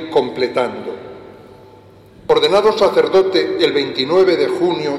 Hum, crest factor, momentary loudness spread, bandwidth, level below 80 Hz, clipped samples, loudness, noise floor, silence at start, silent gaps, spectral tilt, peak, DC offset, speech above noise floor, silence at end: none; 14 dB; 16 LU; 12.5 kHz; -54 dBFS; under 0.1%; -15 LUFS; -43 dBFS; 0 s; none; -5 dB/octave; -2 dBFS; under 0.1%; 28 dB; 0 s